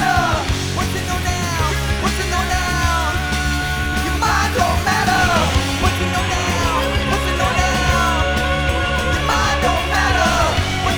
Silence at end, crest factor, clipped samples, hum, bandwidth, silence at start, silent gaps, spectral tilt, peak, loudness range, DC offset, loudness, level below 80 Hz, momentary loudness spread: 0 s; 16 dB; under 0.1%; none; over 20 kHz; 0 s; none; -4 dB/octave; -2 dBFS; 2 LU; under 0.1%; -17 LUFS; -26 dBFS; 5 LU